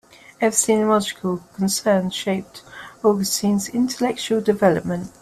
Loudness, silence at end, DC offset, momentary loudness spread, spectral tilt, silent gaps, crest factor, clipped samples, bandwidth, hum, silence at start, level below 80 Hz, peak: -20 LUFS; 0.15 s; under 0.1%; 10 LU; -4 dB/octave; none; 20 dB; under 0.1%; 14.5 kHz; none; 0.4 s; -58 dBFS; -2 dBFS